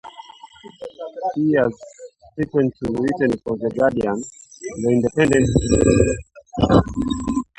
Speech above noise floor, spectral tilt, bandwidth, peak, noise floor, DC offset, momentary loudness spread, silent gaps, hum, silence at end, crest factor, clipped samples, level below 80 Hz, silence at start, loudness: 25 dB; -6.5 dB/octave; 11 kHz; 0 dBFS; -43 dBFS; under 0.1%; 20 LU; none; none; 0.15 s; 20 dB; under 0.1%; -36 dBFS; 0.05 s; -19 LUFS